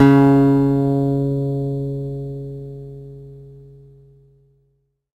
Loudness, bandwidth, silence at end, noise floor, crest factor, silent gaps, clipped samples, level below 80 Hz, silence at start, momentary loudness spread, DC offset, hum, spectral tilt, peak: -18 LUFS; 7.8 kHz; 1.6 s; -66 dBFS; 18 dB; none; under 0.1%; -46 dBFS; 0 s; 24 LU; under 0.1%; none; -10 dB/octave; 0 dBFS